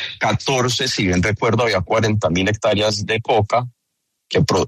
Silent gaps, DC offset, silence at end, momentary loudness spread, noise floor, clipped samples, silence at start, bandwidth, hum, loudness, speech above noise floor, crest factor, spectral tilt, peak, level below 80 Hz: none; under 0.1%; 0 s; 3 LU; -74 dBFS; under 0.1%; 0 s; 13.5 kHz; none; -18 LUFS; 57 dB; 14 dB; -4.5 dB/octave; -4 dBFS; -44 dBFS